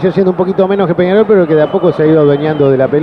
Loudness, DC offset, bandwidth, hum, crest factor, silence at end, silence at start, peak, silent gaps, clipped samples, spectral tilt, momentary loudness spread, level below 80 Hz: -10 LUFS; 0.2%; 5.4 kHz; none; 10 dB; 0 s; 0 s; 0 dBFS; none; under 0.1%; -10 dB/octave; 3 LU; -48 dBFS